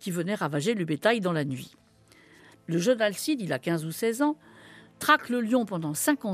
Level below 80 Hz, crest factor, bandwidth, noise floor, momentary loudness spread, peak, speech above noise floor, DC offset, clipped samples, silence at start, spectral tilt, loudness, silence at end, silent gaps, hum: -74 dBFS; 22 dB; 15.5 kHz; -57 dBFS; 9 LU; -6 dBFS; 31 dB; under 0.1%; under 0.1%; 0 s; -4.5 dB/octave; -27 LUFS; 0 s; none; none